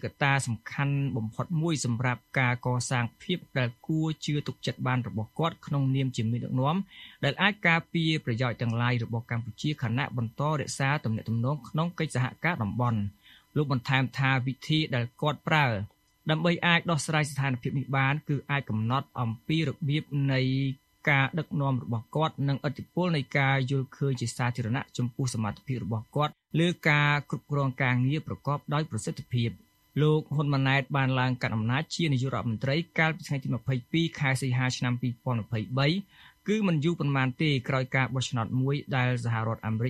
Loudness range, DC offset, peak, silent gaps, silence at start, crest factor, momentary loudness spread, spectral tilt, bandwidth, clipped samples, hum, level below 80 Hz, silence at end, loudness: 3 LU; under 0.1%; -6 dBFS; none; 0.05 s; 22 dB; 7 LU; -6 dB/octave; 13 kHz; under 0.1%; none; -62 dBFS; 0 s; -28 LUFS